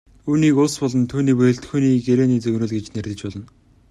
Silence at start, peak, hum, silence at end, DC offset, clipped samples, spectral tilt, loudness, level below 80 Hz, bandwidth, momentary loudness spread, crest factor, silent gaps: 0.25 s; -4 dBFS; none; 0.45 s; under 0.1%; under 0.1%; -7 dB/octave; -19 LUFS; -52 dBFS; 12 kHz; 12 LU; 14 dB; none